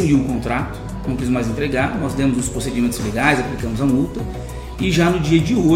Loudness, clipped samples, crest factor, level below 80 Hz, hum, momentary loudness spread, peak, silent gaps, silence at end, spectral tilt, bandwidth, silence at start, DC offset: -19 LUFS; under 0.1%; 16 dB; -32 dBFS; none; 11 LU; -2 dBFS; none; 0 s; -6 dB/octave; 16 kHz; 0 s; under 0.1%